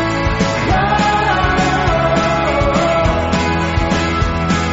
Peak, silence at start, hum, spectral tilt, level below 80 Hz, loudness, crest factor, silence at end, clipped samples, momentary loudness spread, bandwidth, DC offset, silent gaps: -2 dBFS; 0 s; none; -4.5 dB/octave; -24 dBFS; -15 LUFS; 12 dB; 0 s; under 0.1%; 3 LU; 8 kHz; under 0.1%; none